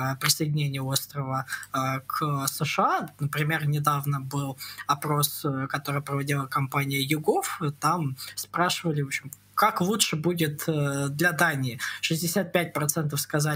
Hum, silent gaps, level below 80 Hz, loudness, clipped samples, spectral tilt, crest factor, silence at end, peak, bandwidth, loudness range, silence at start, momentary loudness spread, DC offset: none; none; -68 dBFS; -27 LUFS; under 0.1%; -4 dB/octave; 22 dB; 0 s; -6 dBFS; 16 kHz; 2 LU; 0 s; 7 LU; under 0.1%